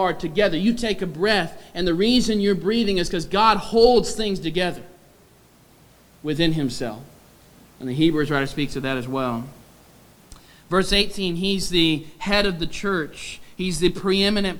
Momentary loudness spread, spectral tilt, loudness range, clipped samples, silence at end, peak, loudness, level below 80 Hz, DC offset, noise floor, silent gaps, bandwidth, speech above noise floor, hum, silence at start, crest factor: 12 LU; -5 dB/octave; 7 LU; under 0.1%; 0 s; -4 dBFS; -21 LUFS; -40 dBFS; under 0.1%; -53 dBFS; none; over 20 kHz; 32 dB; none; 0 s; 20 dB